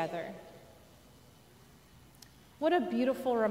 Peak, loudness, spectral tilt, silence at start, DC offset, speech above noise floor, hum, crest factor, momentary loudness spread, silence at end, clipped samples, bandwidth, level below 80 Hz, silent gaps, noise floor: -18 dBFS; -32 LUFS; -6 dB/octave; 0 s; under 0.1%; 28 dB; none; 18 dB; 26 LU; 0 s; under 0.1%; 16 kHz; -68 dBFS; none; -59 dBFS